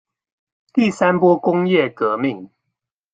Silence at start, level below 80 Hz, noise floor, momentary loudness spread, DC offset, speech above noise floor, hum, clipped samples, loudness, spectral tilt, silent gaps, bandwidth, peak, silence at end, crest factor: 0.75 s; -64 dBFS; -79 dBFS; 8 LU; under 0.1%; 62 dB; none; under 0.1%; -17 LUFS; -7 dB/octave; none; 9 kHz; -2 dBFS; 0.65 s; 18 dB